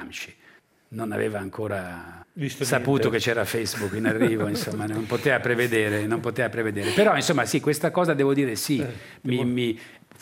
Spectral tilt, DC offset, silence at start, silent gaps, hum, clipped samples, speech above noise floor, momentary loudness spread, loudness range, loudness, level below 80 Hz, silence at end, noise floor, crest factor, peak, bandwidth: -5 dB/octave; under 0.1%; 0 s; none; none; under 0.1%; 32 dB; 12 LU; 4 LU; -24 LUFS; -66 dBFS; 0.25 s; -56 dBFS; 20 dB; -6 dBFS; 16.5 kHz